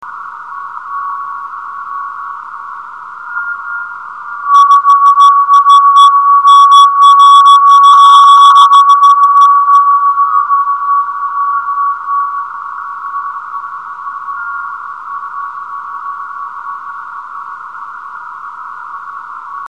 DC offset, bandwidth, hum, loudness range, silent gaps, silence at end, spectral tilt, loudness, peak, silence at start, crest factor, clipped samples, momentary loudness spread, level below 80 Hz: 0.4%; 11 kHz; none; 20 LU; none; 0.1 s; 2.5 dB/octave; -5 LUFS; 0 dBFS; 0 s; 10 dB; 2%; 23 LU; -70 dBFS